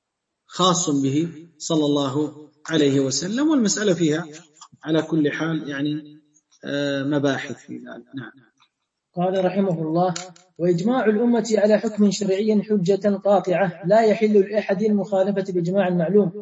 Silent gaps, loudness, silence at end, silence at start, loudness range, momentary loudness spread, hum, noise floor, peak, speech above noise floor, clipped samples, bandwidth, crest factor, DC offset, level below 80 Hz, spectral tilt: none; -21 LUFS; 0 s; 0.5 s; 7 LU; 16 LU; none; -73 dBFS; -4 dBFS; 52 dB; under 0.1%; 8.4 kHz; 16 dB; under 0.1%; -68 dBFS; -5.5 dB/octave